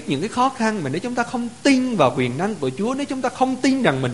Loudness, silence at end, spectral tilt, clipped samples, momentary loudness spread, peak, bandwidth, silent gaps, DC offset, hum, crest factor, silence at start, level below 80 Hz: -21 LUFS; 0 s; -5.5 dB/octave; under 0.1%; 6 LU; 0 dBFS; 11.5 kHz; none; 0.4%; none; 20 dB; 0 s; -56 dBFS